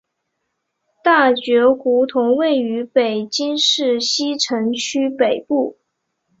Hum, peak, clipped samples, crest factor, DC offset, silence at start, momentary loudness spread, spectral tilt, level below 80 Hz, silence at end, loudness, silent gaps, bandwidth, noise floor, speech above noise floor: none; -2 dBFS; under 0.1%; 16 dB; under 0.1%; 1.05 s; 6 LU; -2.5 dB/octave; -66 dBFS; 0.7 s; -17 LUFS; none; 7.8 kHz; -74 dBFS; 58 dB